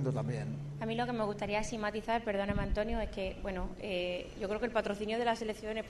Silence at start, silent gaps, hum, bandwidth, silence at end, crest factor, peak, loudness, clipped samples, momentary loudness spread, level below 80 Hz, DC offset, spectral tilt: 0 s; none; none; 12 kHz; 0 s; 16 dB; -18 dBFS; -36 LUFS; under 0.1%; 6 LU; -46 dBFS; under 0.1%; -6 dB/octave